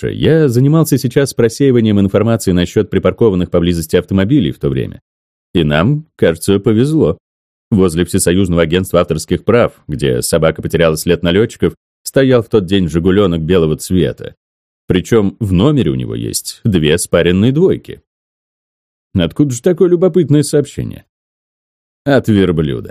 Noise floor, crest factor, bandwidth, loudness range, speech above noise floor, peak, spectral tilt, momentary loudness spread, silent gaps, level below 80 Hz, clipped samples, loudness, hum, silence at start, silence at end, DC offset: under -90 dBFS; 12 dB; 16 kHz; 2 LU; over 78 dB; 0 dBFS; -6 dB/octave; 8 LU; 5.02-5.54 s, 7.20-7.71 s, 11.77-12.05 s, 14.37-14.88 s, 18.07-19.11 s, 21.09-22.05 s; -36 dBFS; under 0.1%; -13 LUFS; none; 0 s; 0 s; 0.2%